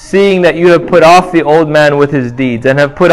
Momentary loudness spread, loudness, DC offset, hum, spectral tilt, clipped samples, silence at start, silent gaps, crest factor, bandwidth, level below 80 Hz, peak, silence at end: 7 LU; -8 LUFS; under 0.1%; none; -6 dB/octave; 3%; 0 s; none; 8 dB; 13 kHz; -38 dBFS; 0 dBFS; 0 s